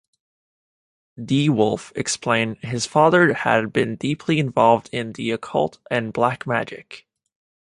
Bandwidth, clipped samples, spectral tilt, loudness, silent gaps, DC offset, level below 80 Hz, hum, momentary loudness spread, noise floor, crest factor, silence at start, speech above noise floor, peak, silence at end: 11.5 kHz; under 0.1%; -5 dB/octave; -20 LUFS; none; under 0.1%; -60 dBFS; none; 10 LU; under -90 dBFS; 20 dB; 1.2 s; over 70 dB; -2 dBFS; 0.7 s